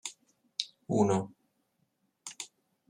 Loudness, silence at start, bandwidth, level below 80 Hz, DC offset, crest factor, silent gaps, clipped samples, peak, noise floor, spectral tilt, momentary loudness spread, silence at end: -33 LUFS; 0.05 s; 14 kHz; -76 dBFS; under 0.1%; 26 dB; none; under 0.1%; -10 dBFS; -77 dBFS; -5 dB/octave; 18 LU; 0.45 s